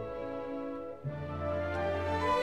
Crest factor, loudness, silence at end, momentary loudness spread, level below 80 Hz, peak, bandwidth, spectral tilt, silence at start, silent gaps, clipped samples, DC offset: 16 dB; -36 LUFS; 0 s; 8 LU; -52 dBFS; -18 dBFS; 12 kHz; -7 dB/octave; 0 s; none; under 0.1%; 0.2%